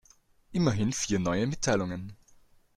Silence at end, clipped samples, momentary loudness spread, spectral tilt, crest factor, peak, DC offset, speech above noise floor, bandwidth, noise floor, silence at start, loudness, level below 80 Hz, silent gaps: 0.6 s; under 0.1%; 10 LU; -5 dB/octave; 18 dB; -12 dBFS; under 0.1%; 34 dB; 13 kHz; -62 dBFS; 0.5 s; -29 LUFS; -54 dBFS; none